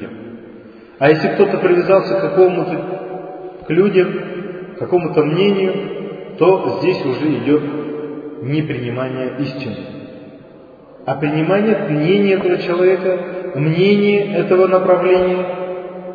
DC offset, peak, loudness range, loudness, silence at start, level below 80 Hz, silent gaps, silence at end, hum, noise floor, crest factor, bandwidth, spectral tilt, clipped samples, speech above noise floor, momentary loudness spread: under 0.1%; 0 dBFS; 7 LU; -16 LUFS; 0 s; -56 dBFS; none; 0 s; none; -40 dBFS; 16 dB; 5 kHz; -9 dB/octave; under 0.1%; 26 dB; 16 LU